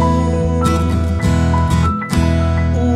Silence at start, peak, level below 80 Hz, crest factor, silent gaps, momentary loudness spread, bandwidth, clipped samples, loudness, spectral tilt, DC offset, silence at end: 0 s; -2 dBFS; -22 dBFS; 12 dB; none; 2 LU; 12.5 kHz; under 0.1%; -16 LUFS; -7 dB/octave; under 0.1%; 0 s